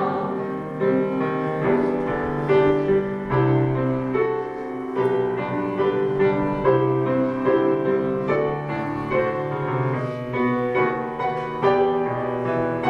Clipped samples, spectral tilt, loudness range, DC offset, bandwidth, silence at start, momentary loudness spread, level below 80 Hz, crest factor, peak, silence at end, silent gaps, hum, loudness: under 0.1%; -9 dB/octave; 2 LU; under 0.1%; 5.8 kHz; 0 s; 6 LU; -48 dBFS; 16 dB; -6 dBFS; 0 s; none; none; -22 LUFS